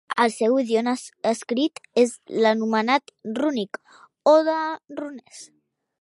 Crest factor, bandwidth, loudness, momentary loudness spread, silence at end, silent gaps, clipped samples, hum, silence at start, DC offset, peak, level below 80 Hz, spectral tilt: 18 dB; 11.5 kHz; -22 LUFS; 16 LU; 0.55 s; none; under 0.1%; none; 0.1 s; under 0.1%; -4 dBFS; -78 dBFS; -4 dB/octave